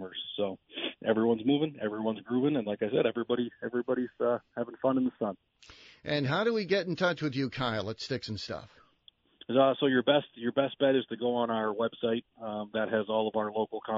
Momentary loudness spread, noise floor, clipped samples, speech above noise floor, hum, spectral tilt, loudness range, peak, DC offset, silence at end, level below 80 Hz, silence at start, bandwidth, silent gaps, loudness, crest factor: 10 LU; -64 dBFS; under 0.1%; 33 dB; none; -4 dB/octave; 3 LU; -12 dBFS; under 0.1%; 0 s; -70 dBFS; 0 s; 7.6 kHz; none; -31 LUFS; 20 dB